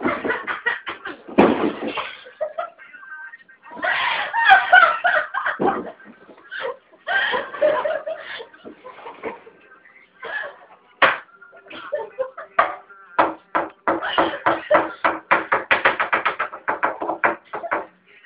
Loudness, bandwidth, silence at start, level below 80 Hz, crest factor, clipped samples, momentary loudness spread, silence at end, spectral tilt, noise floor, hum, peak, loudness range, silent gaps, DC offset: -20 LUFS; 5.2 kHz; 0 s; -62 dBFS; 22 dB; under 0.1%; 19 LU; 0.4 s; -6.5 dB/octave; -50 dBFS; none; 0 dBFS; 8 LU; none; under 0.1%